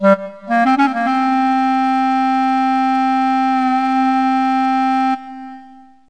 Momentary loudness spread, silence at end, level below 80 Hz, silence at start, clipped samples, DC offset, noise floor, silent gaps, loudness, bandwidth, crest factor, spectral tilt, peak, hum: 4 LU; 0.4 s; -60 dBFS; 0 s; under 0.1%; 0.4%; -42 dBFS; none; -16 LUFS; 9.8 kHz; 16 dB; -6 dB/octave; 0 dBFS; none